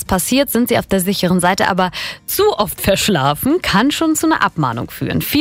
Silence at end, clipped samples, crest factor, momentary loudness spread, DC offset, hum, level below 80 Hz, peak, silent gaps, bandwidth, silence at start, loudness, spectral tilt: 0 s; under 0.1%; 14 dB; 6 LU; under 0.1%; none; -38 dBFS; -2 dBFS; none; 16.5 kHz; 0 s; -15 LUFS; -4 dB/octave